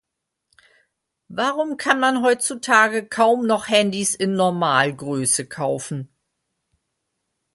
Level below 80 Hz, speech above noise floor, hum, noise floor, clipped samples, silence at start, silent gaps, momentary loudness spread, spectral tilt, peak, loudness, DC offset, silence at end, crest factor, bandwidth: -66 dBFS; 60 dB; none; -80 dBFS; under 0.1%; 1.3 s; none; 9 LU; -3 dB/octave; -2 dBFS; -19 LUFS; under 0.1%; 1.5 s; 20 dB; 12 kHz